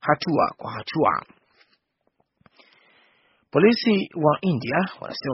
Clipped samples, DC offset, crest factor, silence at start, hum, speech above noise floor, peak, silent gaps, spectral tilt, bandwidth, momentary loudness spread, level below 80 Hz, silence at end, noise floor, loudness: under 0.1%; under 0.1%; 22 dB; 0.05 s; none; 48 dB; -2 dBFS; none; -4.5 dB/octave; 6 kHz; 11 LU; -62 dBFS; 0 s; -70 dBFS; -22 LUFS